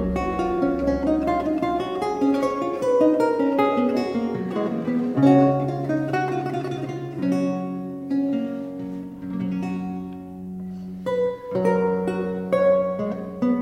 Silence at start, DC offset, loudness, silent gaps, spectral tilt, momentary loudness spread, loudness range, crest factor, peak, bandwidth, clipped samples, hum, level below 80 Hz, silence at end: 0 s; under 0.1%; -23 LUFS; none; -8 dB/octave; 12 LU; 8 LU; 18 dB; -4 dBFS; 11 kHz; under 0.1%; none; -46 dBFS; 0 s